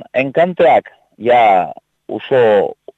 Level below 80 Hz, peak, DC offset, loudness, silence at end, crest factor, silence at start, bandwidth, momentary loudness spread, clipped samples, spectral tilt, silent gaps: -60 dBFS; -2 dBFS; under 0.1%; -13 LUFS; 0.25 s; 12 dB; 0 s; 7.8 kHz; 14 LU; under 0.1%; -7 dB/octave; none